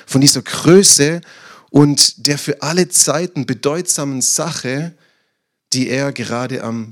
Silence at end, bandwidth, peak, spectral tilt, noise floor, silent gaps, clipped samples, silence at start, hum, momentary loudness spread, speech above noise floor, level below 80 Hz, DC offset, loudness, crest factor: 0 s; over 20 kHz; 0 dBFS; -3.5 dB/octave; -69 dBFS; none; 0.4%; 0.1 s; none; 13 LU; 55 dB; -56 dBFS; under 0.1%; -14 LUFS; 16 dB